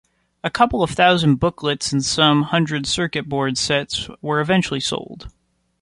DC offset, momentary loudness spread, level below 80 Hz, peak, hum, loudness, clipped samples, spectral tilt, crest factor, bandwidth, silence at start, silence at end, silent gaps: under 0.1%; 11 LU; -46 dBFS; -2 dBFS; none; -19 LUFS; under 0.1%; -4.5 dB/octave; 18 dB; 11.5 kHz; 0.45 s; 0.55 s; none